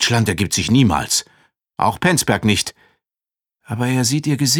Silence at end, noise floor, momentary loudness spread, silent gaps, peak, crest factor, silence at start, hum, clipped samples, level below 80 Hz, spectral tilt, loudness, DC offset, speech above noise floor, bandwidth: 0 s; under -90 dBFS; 8 LU; none; 0 dBFS; 18 dB; 0 s; none; under 0.1%; -44 dBFS; -4 dB/octave; -17 LUFS; under 0.1%; over 73 dB; 19.5 kHz